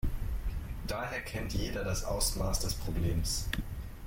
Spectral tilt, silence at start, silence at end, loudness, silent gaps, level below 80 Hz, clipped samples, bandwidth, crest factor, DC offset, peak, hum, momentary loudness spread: -4 dB/octave; 0.05 s; 0 s; -35 LUFS; none; -38 dBFS; under 0.1%; 16.5 kHz; 18 dB; under 0.1%; -16 dBFS; none; 8 LU